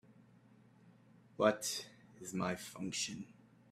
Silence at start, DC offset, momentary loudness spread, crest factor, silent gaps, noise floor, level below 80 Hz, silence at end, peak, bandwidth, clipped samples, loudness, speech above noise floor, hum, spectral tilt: 0.1 s; under 0.1%; 21 LU; 24 dB; none; -65 dBFS; -78 dBFS; 0.4 s; -16 dBFS; 15.5 kHz; under 0.1%; -38 LUFS; 27 dB; none; -3.5 dB/octave